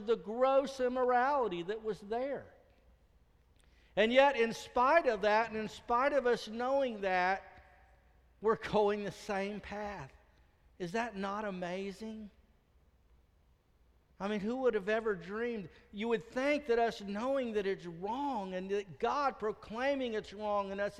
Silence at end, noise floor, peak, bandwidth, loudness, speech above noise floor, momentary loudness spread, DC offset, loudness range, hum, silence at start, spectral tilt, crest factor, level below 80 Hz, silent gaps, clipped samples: 0 s; -69 dBFS; -14 dBFS; 12.5 kHz; -34 LUFS; 35 dB; 12 LU; under 0.1%; 11 LU; none; 0 s; -5 dB/octave; 22 dB; -64 dBFS; none; under 0.1%